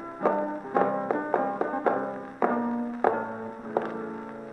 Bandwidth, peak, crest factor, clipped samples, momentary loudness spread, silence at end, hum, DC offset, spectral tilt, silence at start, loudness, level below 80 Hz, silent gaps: 9.2 kHz; -6 dBFS; 22 dB; under 0.1%; 9 LU; 0 s; none; under 0.1%; -8 dB/octave; 0 s; -29 LUFS; -70 dBFS; none